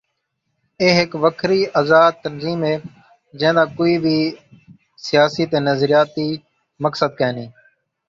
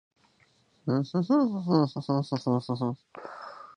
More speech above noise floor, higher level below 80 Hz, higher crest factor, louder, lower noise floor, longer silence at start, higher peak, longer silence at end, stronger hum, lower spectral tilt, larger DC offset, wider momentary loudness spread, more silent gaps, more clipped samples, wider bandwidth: first, 56 dB vs 38 dB; first, -58 dBFS vs -72 dBFS; about the same, 18 dB vs 20 dB; first, -17 LUFS vs -28 LUFS; first, -73 dBFS vs -66 dBFS; about the same, 0.8 s vs 0.85 s; first, 0 dBFS vs -10 dBFS; first, 0.6 s vs 0.05 s; neither; second, -6 dB/octave vs -8.5 dB/octave; neither; second, 11 LU vs 17 LU; neither; neither; second, 7.6 kHz vs 10 kHz